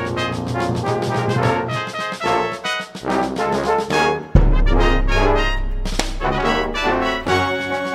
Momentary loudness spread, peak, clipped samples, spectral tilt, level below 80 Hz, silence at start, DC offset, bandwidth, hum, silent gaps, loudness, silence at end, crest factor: 6 LU; 0 dBFS; under 0.1%; -5.5 dB/octave; -22 dBFS; 0 s; under 0.1%; 13 kHz; none; none; -20 LUFS; 0 s; 18 dB